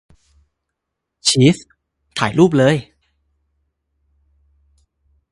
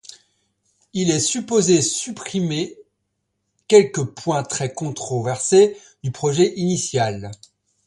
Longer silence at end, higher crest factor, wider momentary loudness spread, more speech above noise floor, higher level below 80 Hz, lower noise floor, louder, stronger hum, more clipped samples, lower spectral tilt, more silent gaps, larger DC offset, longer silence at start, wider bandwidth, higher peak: first, 2.5 s vs 0.5 s; about the same, 20 dB vs 20 dB; about the same, 11 LU vs 13 LU; first, 65 dB vs 55 dB; about the same, -54 dBFS vs -58 dBFS; first, -79 dBFS vs -74 dBFS; first, -16 LUFS vs -20 LUFS; neither; neither; about the same, -5 dB/octave vs -4.5 dB/octave; neither; neither; first, 1.25 s vs 0.95 s; about the same, 11.5 kHz vs 11.5 kHz; about the same, 0 dBFS vs 0 dBFS